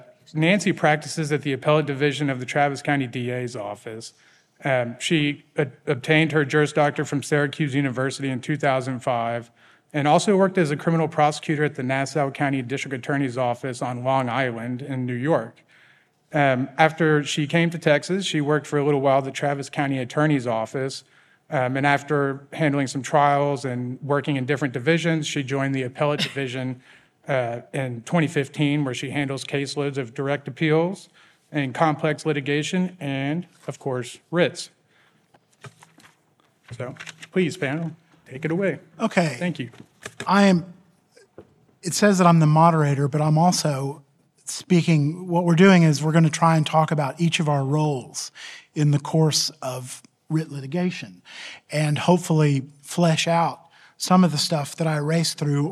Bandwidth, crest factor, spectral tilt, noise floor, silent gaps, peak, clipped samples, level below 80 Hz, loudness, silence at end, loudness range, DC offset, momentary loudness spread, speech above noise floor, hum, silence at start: 13.5 kHz; 22 dB; -5.5 dB/octave; -63 dBFS; none; -2 dBFS; under 0.1%; -70 dBFS; -22 LUFS; 0 s; 7 LU; under 0.1%; 13 LU; 41 dB; none; 0.35 s